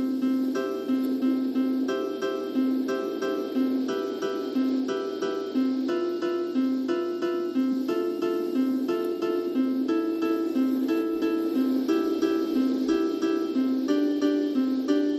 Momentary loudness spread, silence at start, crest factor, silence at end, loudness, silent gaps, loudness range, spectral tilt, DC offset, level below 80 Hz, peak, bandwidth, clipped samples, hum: 4 LU; 0 s; 14 dB; 0 s; -26 LUFS; none; 2 LU; -5.5 dB/octave; under 0.1%; -70 dBFS; -12 dBFS; 13.5 kHz; under 0.1%; none